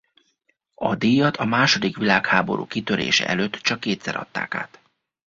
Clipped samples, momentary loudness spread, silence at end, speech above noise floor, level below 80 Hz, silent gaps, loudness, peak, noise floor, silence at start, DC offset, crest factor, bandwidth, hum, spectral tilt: under 0.1%; 10 LU; 0.65 s; 48 dB; -58 dBFS; none; -21 LUFS; -2 dBFS; -69 dBFS; 0.8 s; under 0.1%; 22 dB; 7.6 kHz; none; -4 dB/octave